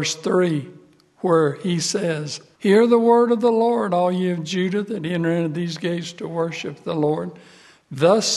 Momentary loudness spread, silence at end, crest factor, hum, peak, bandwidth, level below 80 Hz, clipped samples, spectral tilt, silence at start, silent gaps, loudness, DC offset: 12 LU; 0 s; 18 dB; none; -2 dBFS; 12.5 kHz; -68 dBFS; under 0.1%; -5 dB/octave; 0 s; none; -20 LUFS; under 0.1%